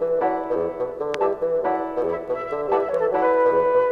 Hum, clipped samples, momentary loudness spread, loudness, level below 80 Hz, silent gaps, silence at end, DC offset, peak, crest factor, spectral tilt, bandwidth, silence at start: none; under 0.1%; 8 LU; -22 LUFS; -56 dBFS; none; 0 s; under 0.1%; -8 dBFS; 14 dB; -6.5 dB/octave; 6.6 kHz; 0 s